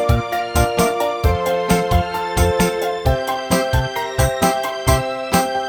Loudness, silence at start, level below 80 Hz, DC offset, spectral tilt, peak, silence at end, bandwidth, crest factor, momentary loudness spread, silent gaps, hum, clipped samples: -18 LUFS; 0 s; -26 dBFS; under 0.1%; -5 dB/octave; 0 dBFS; 0 s; 19.5 kHz; 16 dB; 3 LU; none; none; under 0.1%